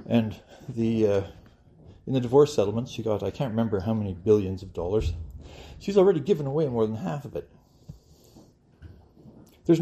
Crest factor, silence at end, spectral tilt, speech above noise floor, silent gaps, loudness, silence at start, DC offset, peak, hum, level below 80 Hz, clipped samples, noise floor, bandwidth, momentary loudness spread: 20 dB; 0 s; -7.5 dB/octave; 30 dB; none; -26 LUFS; 0 s; under 0.1%; -8 dBFS; none; -48 dBFS; under 0.1%; -55 dBFS; 13.5 kHz; 18 LU